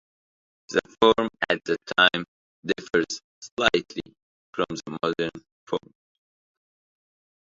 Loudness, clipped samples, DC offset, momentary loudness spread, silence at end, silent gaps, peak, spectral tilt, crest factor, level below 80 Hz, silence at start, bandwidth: -25 LUFS; under 0.1%; under 0.1%; 17 LU; 1.65 s; 2.28-2.63 s, 3.24-3.42 s, 3.52-3.57 s, 4.22-4.53 s, 5.52-5.67 s; -2 dBFS; -3.5 dB/octave; 26 dB; -60 dBFS; 0.7 s; 7.8 kHz